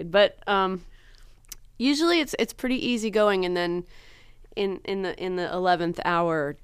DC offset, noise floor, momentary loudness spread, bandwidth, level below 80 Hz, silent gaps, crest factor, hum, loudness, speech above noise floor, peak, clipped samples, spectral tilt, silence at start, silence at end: under 0.1%; -50 dBFS; 10 LU; 15.5 kHz; -50 dBFS; none; 18 dB; none; -25 LUFS; 25 dB; -8 dBFS; under 0.1%; -4.5 dB/octave; 0 s; 0.1 s